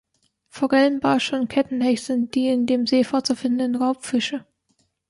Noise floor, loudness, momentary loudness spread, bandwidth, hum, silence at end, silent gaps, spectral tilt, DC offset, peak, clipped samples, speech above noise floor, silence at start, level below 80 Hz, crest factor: -68 dBFS; -21 LUFS; 5 LU; 11.5 kHz; none; 0.7 s; none; -4 dB/octave; under 0.1%; -6 dBFS; under 0.1%; 47 dB; 0.55 s; -64 dBFS; 16 dB